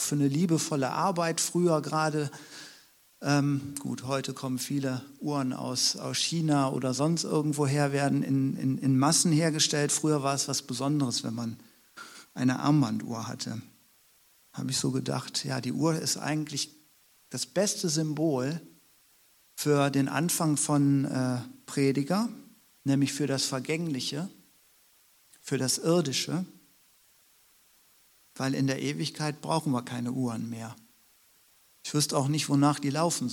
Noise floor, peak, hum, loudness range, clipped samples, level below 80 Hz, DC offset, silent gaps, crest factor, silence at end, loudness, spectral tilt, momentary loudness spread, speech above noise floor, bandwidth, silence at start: -63 dBFS; -10 dBFS; none; 6 LU; under 0.1%; -74 dBFS; under 0.1%; none; 20 dB; 0 s; -28 LUFS; -4.5 dB/octave; 12 LU; 35 dB; 18.5 kHz; 0 s